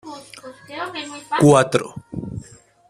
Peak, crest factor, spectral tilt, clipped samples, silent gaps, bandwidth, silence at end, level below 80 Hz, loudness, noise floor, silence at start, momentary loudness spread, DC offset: 0 dBFS; 20 dB; -5.5 dB/octave; under 0.1%; none; 13 kHz; 0.45 s; -52 dBFS; -18 LUFS; -46 dBFS; 0.05 s; 23 LU; under 0.1%